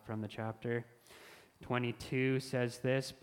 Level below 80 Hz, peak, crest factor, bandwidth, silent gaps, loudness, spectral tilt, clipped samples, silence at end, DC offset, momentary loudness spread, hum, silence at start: -68 dBFS; -18 dBFS; 18 dB; 16.5 kHz; none; -37 LUFS; -6 dB/octave; under 0.1%; 0.1 s; under 0.1%; 22 LU; none; 0.05 s